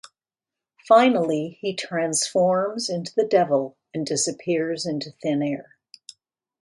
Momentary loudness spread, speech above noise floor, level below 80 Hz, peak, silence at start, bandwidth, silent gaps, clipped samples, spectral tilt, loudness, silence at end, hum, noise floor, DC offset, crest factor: 11 LU; 68 dB; -70 dBFS; -4 dBFS; 0.85 s; 11.5 kHz; none; under 0.1%; -4 dB/octave; -23 LUFS; 1 s; none; -90 dBFS; under 0.1%; 20 dB